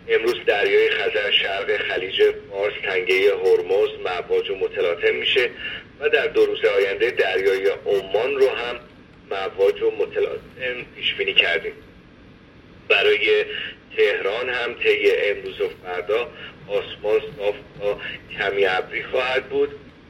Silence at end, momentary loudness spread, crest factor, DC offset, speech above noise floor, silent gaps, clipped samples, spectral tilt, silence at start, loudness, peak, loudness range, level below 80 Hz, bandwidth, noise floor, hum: 0.2 s; 10 LU; 20 dB; under 0.1%; 26 dB; none; under 0.1%; -4 dB/octave; 0.05 s; -21 LUFS; -2 dBFS; 4 LU; -54 dBFS; 14.5 kHz; -47 dBFS; none